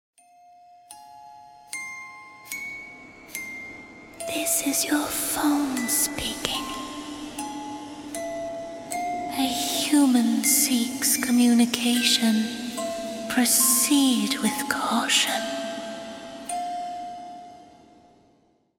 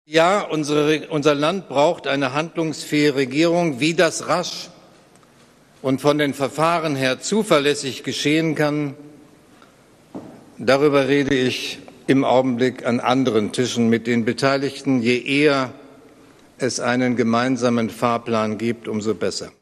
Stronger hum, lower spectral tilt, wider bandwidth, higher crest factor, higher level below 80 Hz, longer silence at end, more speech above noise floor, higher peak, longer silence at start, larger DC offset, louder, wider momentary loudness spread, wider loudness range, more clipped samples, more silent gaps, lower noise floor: neither; second, -1.5 dB/octave vs -5 dB/octave; first, 17.5 kHz vs 14.5 kHz; first, 26 dB vs 18 dB; about the same, -58 dBFS vs -60 dBFS; first, 1.15 s vs 0.1 s; first, 41 dB vs 32 dB; about the same, 0 dBFS vs -2 dBFS; first, 0.9 s vs 0.1 s; neither; second, -23 LUFS vs -20 LUFS; first, 18 LU vs 8 LU; first, 15 LU vs 3 LU; neither; neither; first, -63 dBFS vs -52 dBFS